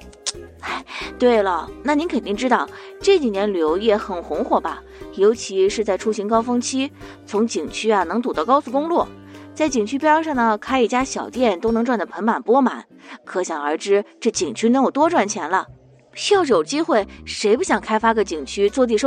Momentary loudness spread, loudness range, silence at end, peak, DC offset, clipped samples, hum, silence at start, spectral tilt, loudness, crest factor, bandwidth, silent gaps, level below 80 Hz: 11 LU; 2 LU; 0 s; -2 dBFS; under 0.1%; under 0.1%; none; 0 s; -4 dB/octave; -20 LUFS; 18 dB; 10 kHz; none; -48 dBFS